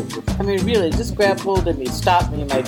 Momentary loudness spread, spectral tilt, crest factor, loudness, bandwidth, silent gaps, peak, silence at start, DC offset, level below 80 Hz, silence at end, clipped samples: 5 LU; -5.5 dB/octave; 16 dB; -19 LUFS; 19 kHz; none; -2 dBFS; 0 s; under 0.1%; -30 dBFS; 0 s; under 0.1%